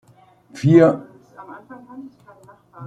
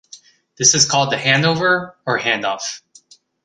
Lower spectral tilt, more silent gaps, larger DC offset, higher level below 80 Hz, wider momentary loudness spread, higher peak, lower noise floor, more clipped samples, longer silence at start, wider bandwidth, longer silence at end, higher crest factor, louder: first, -8.5 dB/octave vs -2 dB/octave; neither; neither; about the same, -62 dBFS vs -58 dBFS; first, 27 LU vs 12 LU; about the same, -2 dBFS vs 0 dBFS; about the same, -52 dBFS vs -50 dBFS; neither; first, 0.55 s vs 0.15 s; second, 8.8 kHz vs 11 kHz; second, 0 s vs 0.65 s; about the same, 18 dB vs 18 dB; about the same, -16 LUFS vs -16 LUFS